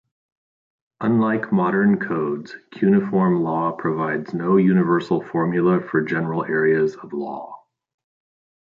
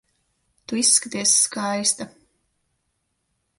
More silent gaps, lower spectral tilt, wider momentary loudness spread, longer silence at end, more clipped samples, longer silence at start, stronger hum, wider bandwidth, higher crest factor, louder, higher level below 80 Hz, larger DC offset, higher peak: neither; first, -9.5 dB/octave vs -1 dB/octave; about the same, 11 LU vs 12 LU; second, 1.1 s vs 1.5 s; neither; first, 1 s vs 0.7 s; neither; second, 7 kHz vs 12 kHz; second, 16 dB vs 24 dB; about the same, -20 LUFS vs -19 LUFS; first, -64 dBFS vs -70 dBFS; neither; second, -6 dBFS vs -2 dBFS